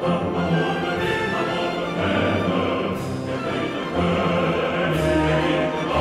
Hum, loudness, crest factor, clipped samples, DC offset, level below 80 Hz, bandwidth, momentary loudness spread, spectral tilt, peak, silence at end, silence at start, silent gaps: none; -22 LUFS; 14 dB; under 0.1%; under 0.1%; -42 dBFS; 14.5 kHz; 5 LU; -6.5 dB/octave; -8 dBFS; 0 s; 0 s; none